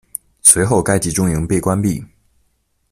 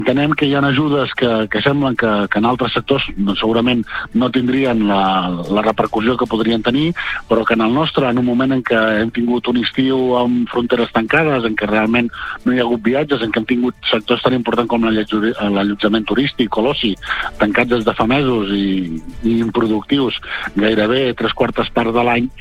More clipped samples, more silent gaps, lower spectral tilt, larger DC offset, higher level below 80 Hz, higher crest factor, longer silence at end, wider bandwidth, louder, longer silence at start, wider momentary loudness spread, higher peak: first, 0.1% vs under 0.1%; neither; second, -4.5 dB/octave vs -7 dB/octave; neither; about the same, -40 dBFS vs -40 dBFS; about the same, 18 dB vs 14 dB; first, 0.85 s vs 0 s; first, 16 kHz vs 9 kHz; about the same, -14 LUFS vs -16 LUFS; first, 0.45 s vs 0 s; first, 12 LU vs 4 LU; about the same, 0 dBFS vs -2 dBFS